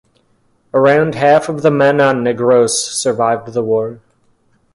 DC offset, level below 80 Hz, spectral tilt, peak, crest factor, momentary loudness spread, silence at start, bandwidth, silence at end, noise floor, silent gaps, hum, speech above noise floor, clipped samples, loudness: under 0.1%; -56 dBFS; -4.5 dB/octave; 0 dBFS; 14 dB; 7 LU; 0.75 s; 11.5 kHz; 0.8 s; -57 dBFS; none; none; 44 dB; under 0.1%; -13 LUFS